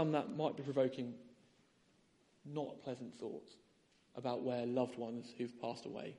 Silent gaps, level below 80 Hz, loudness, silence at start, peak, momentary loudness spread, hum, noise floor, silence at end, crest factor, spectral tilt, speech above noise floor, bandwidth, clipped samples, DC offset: none; -84 dBFS; -42 LUFS; 0 s; -22 dBFS; 11 LU; none; -73 dBFS; 0 s; 20 dB; -7 dB/octave; 32 dB; 11 kHz; under 0.1%; under 0.1%